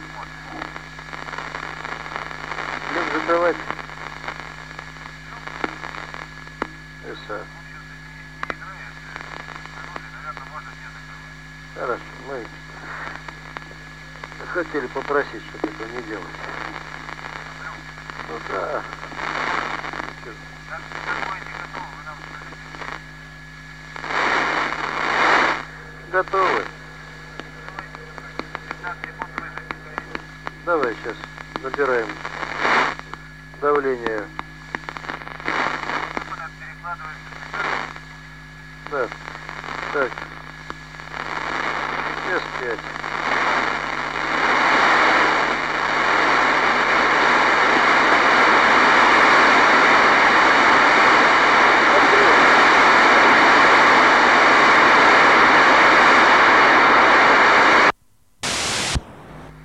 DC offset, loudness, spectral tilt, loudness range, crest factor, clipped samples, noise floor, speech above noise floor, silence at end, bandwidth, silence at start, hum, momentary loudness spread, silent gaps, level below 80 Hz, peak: 0.2%; -16 LUFS; -3 dB/octave; 21 LU; 16 dB; under 0.1%; -58 dBFS; 33 dB; 0 s; 15 kHz; 0 s; none; 24 LU; none; -46 dBFS; -4 dBFS